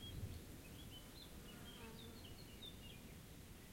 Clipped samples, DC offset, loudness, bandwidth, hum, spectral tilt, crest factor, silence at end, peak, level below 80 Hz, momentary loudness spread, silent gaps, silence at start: under 0.1%; under 0.1%; -56 LUFS; 16.5 kHz; none; -4.5 dB/octave; 16 dB; 0 s; -38 dBFS; -62 dBFS; 5 LU; none; 0 s